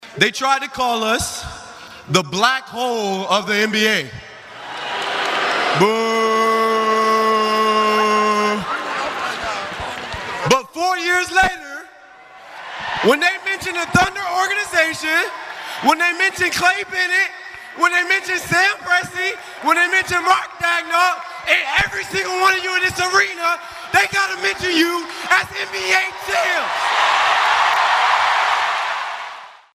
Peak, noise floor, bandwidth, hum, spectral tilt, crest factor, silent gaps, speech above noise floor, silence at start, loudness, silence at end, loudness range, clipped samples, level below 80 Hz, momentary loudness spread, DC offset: 0 dBFS; -43 dBFS; 15.5 kHz; none; -2.5 dB/octave; 18 dB; none; 25 dB; 0 s; -17 LUFS; 0.2 s; 3 LU; under 0.1%; -50 dBFS; 11 LU; under 0.1%